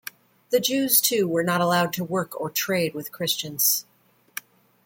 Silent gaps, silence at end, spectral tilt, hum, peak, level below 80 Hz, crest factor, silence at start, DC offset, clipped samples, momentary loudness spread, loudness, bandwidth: none; 1.05 s; -3 dB/octave; none; -6 dBFS; -68 dBFS; 20 dB; 0.5 s; under 0.1%; under 0.1%; 20 LU; -22 LUFS; 17 kHz